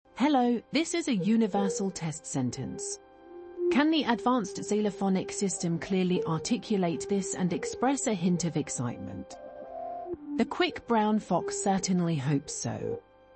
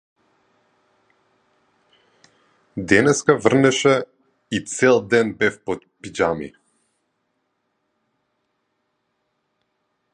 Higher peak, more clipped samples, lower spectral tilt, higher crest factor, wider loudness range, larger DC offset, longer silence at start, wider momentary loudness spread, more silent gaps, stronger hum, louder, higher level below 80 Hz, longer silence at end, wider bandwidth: second, -10 dBFS vs 0 dBFS; neither; about the same, -5 dB/octave vs -4.5 dB/octave; about the same, 18 dB vs 22 dB; second, 3 LU vs 12 LU; neither; second, 0.15 s vs 2.75 s; second, 13 LU vs 17 LU; neither; neither; second, -29 LUFS vs -19 LUFS; second, -64 dBFS vs -56 dBFS; second, 0.35 s vs 3.65 s; second, 8.8 kHz vs 11 kHz